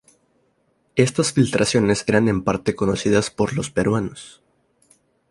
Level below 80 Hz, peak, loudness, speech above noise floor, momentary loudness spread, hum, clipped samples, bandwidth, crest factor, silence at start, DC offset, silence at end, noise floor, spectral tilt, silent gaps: -48 dBFS; -2 dBFS; -20 LUFS; 46 dB; 6 LU; none; under 0.1%; 11.5 kHz; 18 dB; 0.95 s; under 0.1%; 1 s; -65 dBFS; -5 dB/octave; none